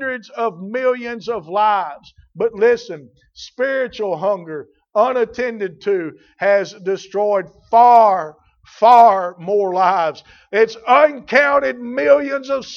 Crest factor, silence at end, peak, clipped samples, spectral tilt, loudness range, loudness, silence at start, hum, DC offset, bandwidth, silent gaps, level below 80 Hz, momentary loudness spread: 16 dB; 0 s; 0 dBFS; under 0.1%; -5 dB/octave; 7 LU; -16 LUFS; 0 s; none; under 0.1%; 7 kHz; none; -60 dBFS; 13 LU